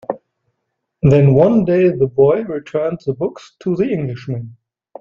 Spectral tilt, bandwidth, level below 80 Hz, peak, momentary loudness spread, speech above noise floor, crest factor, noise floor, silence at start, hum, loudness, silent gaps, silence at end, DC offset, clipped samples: -10 dB/octave; 7 kHz; -46 dBFS; 0 dBFS; 16 LU; 60 dB; 16 dB; -74 dBFS; 0.1 s; none; -15 LUFS; none; 0.5 s; under 0.1%; under 0.1%